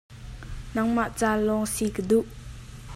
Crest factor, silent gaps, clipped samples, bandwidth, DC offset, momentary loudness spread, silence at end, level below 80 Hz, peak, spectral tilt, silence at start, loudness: 18 dB; none; under 0.1%; 15 kHz; under 0.1%; 19 LU; 0 s; -44 dBFS; -10 dBFS; -5 dB/octave; 0.1 s; -26 LUFS